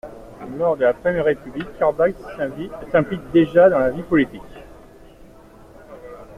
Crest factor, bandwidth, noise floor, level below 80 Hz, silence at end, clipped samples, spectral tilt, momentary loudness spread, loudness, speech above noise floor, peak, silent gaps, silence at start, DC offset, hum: 18 dB; 10.5 kHz; -45 dBFS; -46 dBFS; 0 s; under 0.1%; -8 dB/octave; 24 LU; -19 LUFS; 26 dB; -2 dBFS; none; 0.05 s; under 0.1%; none